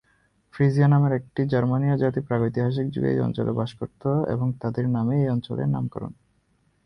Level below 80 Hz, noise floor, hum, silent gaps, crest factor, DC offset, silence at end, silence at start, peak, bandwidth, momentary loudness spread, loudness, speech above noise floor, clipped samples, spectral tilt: -54 dBFS; -66 dBFS; none; none; 16 dB; under 0.1%; 0.7 s; 0.55 s; -8 dBFS; 6 kHz; 9 LU; -24 LUFS; 43 dB; under 0.1%; -10 dB/octave